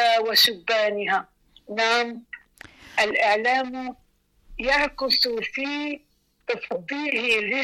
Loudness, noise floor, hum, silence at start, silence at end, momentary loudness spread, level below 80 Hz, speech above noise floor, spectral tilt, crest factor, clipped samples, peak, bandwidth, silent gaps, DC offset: -22 LUFS; -51 dBFS; none; 0 s; 0 s; 17 LU; -54 dBFS; 28 dB; -2 dB/octave; 14 dB; under 0.1%; -10 dBFS; 16.5 kHz; none; under 0.1%